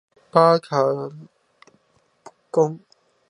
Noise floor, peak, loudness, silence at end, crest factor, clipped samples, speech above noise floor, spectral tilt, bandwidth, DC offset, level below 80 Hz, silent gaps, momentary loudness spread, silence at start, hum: -64 dBFS; -2 dBFS; -20 LUFS; 0.5 s; 22 dB; under 0.1%; 45 dB; -6.5 dB/octave; 10.5 kHz; under 0.1%; -76 dBFS; none; 15 LU; 0.35 s; none